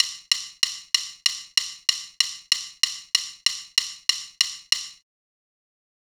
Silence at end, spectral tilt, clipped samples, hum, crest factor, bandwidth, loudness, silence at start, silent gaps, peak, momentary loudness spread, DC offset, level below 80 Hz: 1.1 s; 5.5 dB/octave; under 0.1%; none; 26 dB; over 20 kHz; -23 LUFS; 0 s; none; 0 dBFS; 3 LU; under 0.1%; -72 dBFS